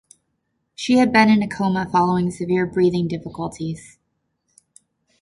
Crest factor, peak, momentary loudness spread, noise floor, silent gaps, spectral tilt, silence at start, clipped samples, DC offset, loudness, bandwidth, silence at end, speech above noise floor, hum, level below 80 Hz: 18 dB; -2 dBFS; 15 LU; -73 dBFS; none; -6.5 dB/octave; 0.8 s; under 0.1%; under 0.1%; -19 LUFS; 11.5 kHz; 1.4 s; 54 dB; none; -54 dBFS